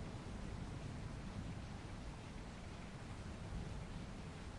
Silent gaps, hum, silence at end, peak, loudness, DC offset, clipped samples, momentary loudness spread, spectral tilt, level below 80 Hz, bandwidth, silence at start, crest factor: none; none; 0 s; -36 dBFS; -50 LUFS; under 0.1%; under 0.1%; 3 LU; -6 dB/octave; -54 dBFS; 11.5 kHz; 0 s; 12 dB